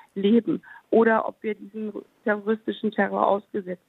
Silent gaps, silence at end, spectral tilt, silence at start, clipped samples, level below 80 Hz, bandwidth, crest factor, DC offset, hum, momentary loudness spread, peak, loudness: none; 0.15 s; -8.5 dB/octave; 0.15 s; under 0.1%; -76 dBFS; 4.1 kHz; 20 dB; under 0.1%; none; 12 LU; -4 dBFS; -25 LUFS